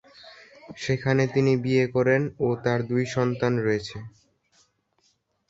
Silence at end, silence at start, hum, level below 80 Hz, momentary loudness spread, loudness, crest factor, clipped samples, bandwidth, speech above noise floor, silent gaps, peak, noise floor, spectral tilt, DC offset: 1.4 s; 0.25 s; none; -58 dBFS; 10 LU; -24 LUFS; 18 dB; under 0.1%; 8 kHz; 45 dB; none; -8 dBFS; -69 dBFS; -7 dB/octave; under 0.1%